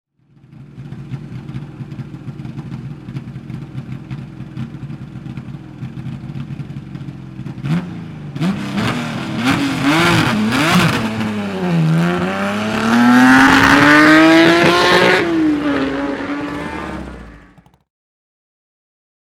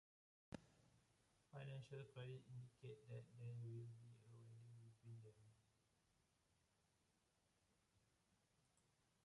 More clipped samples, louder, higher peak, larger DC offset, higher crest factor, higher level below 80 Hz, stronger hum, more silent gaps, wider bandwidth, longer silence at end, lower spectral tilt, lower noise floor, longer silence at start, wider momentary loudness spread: first, 0.1% vs under 0.1%; first, -13 LUFS vs -60 LUFS; first, 0 dBFS vs -40 dBFS; neither; about the same, 16 dB vs 20 dB; first, -42 dBFS vs -86 dBFS; neither; neither; first, 16.5 kHz vs 11 kHz; first, 2 s vs 0.4 s; second, -5.5 dB/octave vs -7 dB/octave; second, -47 dBFS vs -85 dBFS; about the same, 0.5 s vs 0.5 s; first, 22 LU vs 10 LU